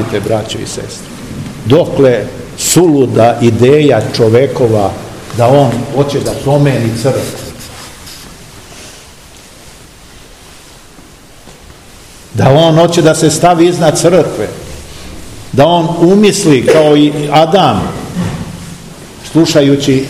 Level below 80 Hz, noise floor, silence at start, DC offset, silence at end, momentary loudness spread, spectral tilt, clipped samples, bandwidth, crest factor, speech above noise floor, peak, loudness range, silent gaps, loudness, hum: -38 dBFS; -36 dBFS; 0 s; 0.4%; 0 s; 21 LU; -5.5 dB/octave; 2%; 16 kHz; 10 dB; 28 dB; 0 dBFS; 8 LU; none; -9 LUFS; none